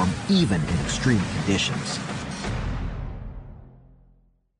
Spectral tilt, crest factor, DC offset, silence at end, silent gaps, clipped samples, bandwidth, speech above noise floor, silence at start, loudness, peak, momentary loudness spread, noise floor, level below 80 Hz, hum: -5 dB/octave; 18 dB; under 0.1%; 0.8 s; none; under 0.1%; 10.5 kHz; 37 dB; 0 s; -25 LUFS; -8 dBFS; 17 LU; -60 dBFS; -38 dBFS; none